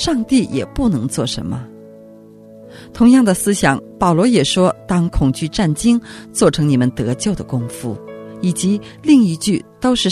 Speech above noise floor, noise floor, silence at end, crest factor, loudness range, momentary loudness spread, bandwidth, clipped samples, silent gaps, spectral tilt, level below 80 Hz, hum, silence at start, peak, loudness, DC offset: 25 dB; -40 dBFS; 0 s; 16 dB; 3 LU; 13 LU; 14 kHz; under 0.1%; none; -5.5 dB/octave; -36 dBFS; none; 0 s; 0 dBFS; -16 LUFS; under 0.1%